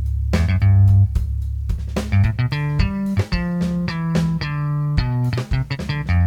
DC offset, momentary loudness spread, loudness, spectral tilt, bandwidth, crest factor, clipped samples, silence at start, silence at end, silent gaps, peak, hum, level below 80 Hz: under 0.1%; 10 LU; -20 LUFS; -7.5 dB/octave; 9 kHz; 14 dB; under 0.1%; 0 s; 0 s; none; -4 dBFS; none; -26 dBFS